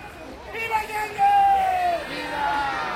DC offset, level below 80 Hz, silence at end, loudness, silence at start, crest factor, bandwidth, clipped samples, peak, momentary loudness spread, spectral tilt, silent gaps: under 0.1%; -50 dBFS; 0 s; -22 LUFS; 0 s; 12 dB; 16 kHz; under 0.1%; -10 dBFS; 14 LU; -3.5 dB/octave; none